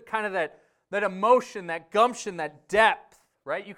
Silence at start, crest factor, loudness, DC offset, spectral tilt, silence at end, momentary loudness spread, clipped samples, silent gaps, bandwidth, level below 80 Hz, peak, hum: 0.05 s; 20 dB; -26 LUFS; under 0.1%; -3.5 dB/octave; 0.05 s; 13 LU; under 0.1%; none; 13.5 kHz; -64 dBFS; -6 dBFS; none